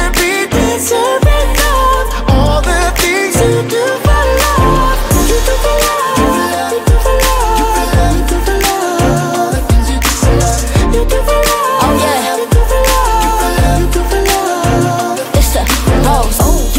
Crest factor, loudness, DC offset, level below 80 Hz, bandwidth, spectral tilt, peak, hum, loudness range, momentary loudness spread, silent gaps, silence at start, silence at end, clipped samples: 10 dB; -11 LUFS; under 0.1%; -14 dBFS; 16.5 kHz; -4.5 dB/octave; 0 dBFS; none; 1 LU; 2 LU; none; 0 s; 0 s; under 0.1%